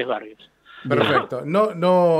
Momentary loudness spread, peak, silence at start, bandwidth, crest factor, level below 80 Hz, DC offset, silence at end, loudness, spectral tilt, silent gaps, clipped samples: 11 LU; -4 dBFS; 0 s; 12.5 kHz; 16 dB; -68 dBFS; under 0.1%; 0 s; -20 LUFS; -7 dB/octave; none; under 0.1%